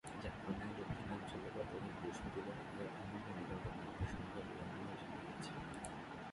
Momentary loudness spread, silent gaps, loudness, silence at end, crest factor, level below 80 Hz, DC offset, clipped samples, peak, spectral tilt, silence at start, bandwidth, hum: 3 LU; none; -48 LUFS; 0 s; 18 dB; -60 dBFS; under 0.1%; under 0.1%; -28 dBFS; -6 dB/octave; 0.05 s; 11.5 kHz; none